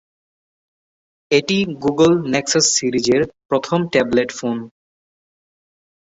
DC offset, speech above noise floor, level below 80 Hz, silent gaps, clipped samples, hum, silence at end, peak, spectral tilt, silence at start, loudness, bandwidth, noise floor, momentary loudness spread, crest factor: under 0.1%; over 73 dB; -54 dBFS; 3.45-3.49 s; under 0.1%; none; 1.45 s; -2 dBFS; -3.5 dB/octave; 1.3 s; -17 LUFS; 8.4 kHz; under -90 dBFS; 8 LU; 18 dB